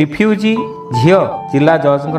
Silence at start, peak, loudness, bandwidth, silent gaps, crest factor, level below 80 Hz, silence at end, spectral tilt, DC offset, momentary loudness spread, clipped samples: 0 s; 0 dBFS; -13 LUFS; 11.5 kHz; none; 12 dB; -48 dBFS; 0 s; -7.5 dB/octave; under 0.1%; 6 LU; under 0.1%